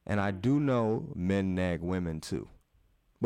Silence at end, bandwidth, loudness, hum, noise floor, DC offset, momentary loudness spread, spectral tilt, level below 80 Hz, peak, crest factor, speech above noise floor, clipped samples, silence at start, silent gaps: 0 s; 13.5 kHz; -31 LUFS; none; -68 dBFS; under 0.1%; 10 LU; -7.5 dB/octave; -54 dBFS; -16 dBFS; 14 dB; 38 dB; under 0.1%; 0.1 s; none